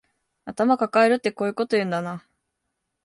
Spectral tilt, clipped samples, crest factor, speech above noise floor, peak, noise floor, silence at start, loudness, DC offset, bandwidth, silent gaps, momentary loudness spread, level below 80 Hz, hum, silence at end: -6 dB/octave; under 0.1%; 18 dB; 57 dB; -6 dBFS; -79 dBFS; 0.45 s; -22 LUFS; under 0.1%; 11.5 kHz; none; 19 LU; -70 dBFS; none; 0.85 s